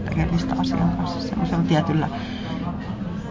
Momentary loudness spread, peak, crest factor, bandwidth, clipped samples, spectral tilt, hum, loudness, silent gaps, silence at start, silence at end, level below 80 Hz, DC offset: 9 LU; -8 dBFS; 16 dB; 7.6 kHz; under 0.1%; -7.5 dB/octave; none; -24 LUFS; none; 0 s; 0 s; -36 dBFS; under 0.1%